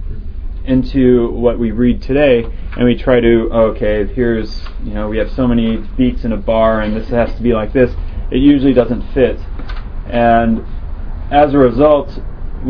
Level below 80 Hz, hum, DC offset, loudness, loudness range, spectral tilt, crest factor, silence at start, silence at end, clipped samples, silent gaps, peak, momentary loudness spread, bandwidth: -22 dBFS; none; under 0.1%; -13 LUFS; 3 LU; -9.5 dB/octave; 14 dB; 0 s; 0 s; under 0.1%; none; 0 dBFS; 17 LU; 5.4 kHz